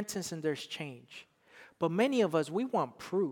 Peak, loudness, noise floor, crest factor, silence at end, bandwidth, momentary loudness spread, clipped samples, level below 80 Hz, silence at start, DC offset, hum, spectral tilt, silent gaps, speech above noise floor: -16 dBFS; -33 LUFS; -59 dBFS; 18 dB; 0 s; 19 kHz; 17 LU; under 0.1%; -78 dBFS; 0 s; under 0.1%; none; -5 dB/octave; none; 26 dB